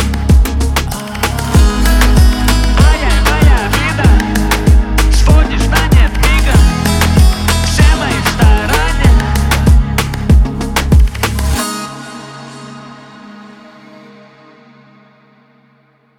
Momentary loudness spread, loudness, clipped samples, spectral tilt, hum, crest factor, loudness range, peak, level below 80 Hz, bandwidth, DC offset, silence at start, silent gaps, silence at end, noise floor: 8 LU; -11 LUFS; under 0.1%; -5 dB/octave; none; 10 dB; 7 LU; 0 dBFS; -12 dBFS; 16.5 kHz; under 0.1%; 0 s; none; 2.7 s; -51 dBFS